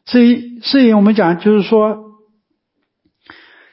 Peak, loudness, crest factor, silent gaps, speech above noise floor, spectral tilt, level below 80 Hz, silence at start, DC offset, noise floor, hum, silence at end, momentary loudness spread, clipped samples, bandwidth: 0 dBFS; -12 LUFS; 14 dB; none; 59 dB; -11 dB/octave; -66 dBFS; 0.1 s; under 0.1%; -71 dBFS; none; 1.7 s; 8 LU; under 0.1%; 5.8 kHz